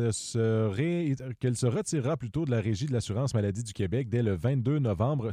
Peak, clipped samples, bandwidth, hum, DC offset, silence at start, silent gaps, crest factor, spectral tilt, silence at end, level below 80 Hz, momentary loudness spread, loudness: -16 dBFS; under 0.1%; 11.5 kHz; none; under 0.1%; 0 s; none; 12 dB; -6.5 dB/octave; 0 s; -56 dBFS; 4 LU; -29 LUFS